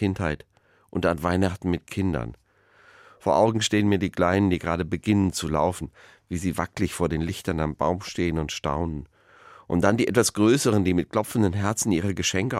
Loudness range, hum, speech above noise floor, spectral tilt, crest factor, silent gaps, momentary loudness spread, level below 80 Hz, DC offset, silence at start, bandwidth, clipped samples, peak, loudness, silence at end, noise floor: 4 LU; none; 34 dB; -5 dB/octave; 20 dB; none; 9 LU; -44 dBFS; under 0.1%; 0 s; 16 kHz; under 0.1%; -6 dBFS; -24 LUFS; 0 s; -58 dBFS